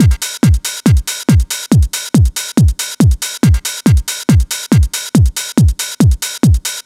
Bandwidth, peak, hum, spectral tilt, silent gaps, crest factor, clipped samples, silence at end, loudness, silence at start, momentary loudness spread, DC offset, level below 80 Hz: 16.5 kHz; 0 dBFS; none; -5 dB/octave; none; 12 dB; under 0.1%; 0.05 s; -13 LUFS; 0 s; 1 LU; under 0.1%; -18 dBFS